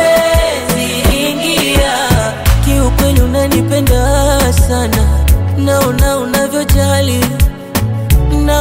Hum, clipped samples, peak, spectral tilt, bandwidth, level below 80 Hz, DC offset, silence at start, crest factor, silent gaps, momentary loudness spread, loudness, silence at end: none; under 0.1%; 0 dBFS; -5 dB/octave; 16.5 kHz; -14 dBFS; under 0.1%; 0 s; 10 dB; none; 3 LU; -12 LUFS; 0 s